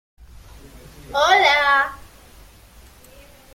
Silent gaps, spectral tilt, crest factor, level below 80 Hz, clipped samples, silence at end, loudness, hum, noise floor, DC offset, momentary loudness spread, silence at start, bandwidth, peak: none; -1.5 dB/octave; 20 dB; -48 dBFS; under 0.1%; 1.6 s; -16 LUFS; none; -47 dBFS; under 0.1%; 12 LU; 1.1 s; 16.5 kHz; -2 dBFS